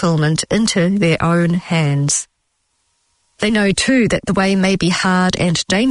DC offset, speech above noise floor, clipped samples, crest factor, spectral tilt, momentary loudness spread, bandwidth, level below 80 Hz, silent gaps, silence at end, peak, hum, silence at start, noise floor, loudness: under 0.1%; 52 dB; under 0.1%; 12 dB; -4.5 dB/octave; 3 LU; 11 kHz; -42 dBFS; none; 0 s; -4 dBFS; none; 0 s; -67 dBFS; -15 LUFS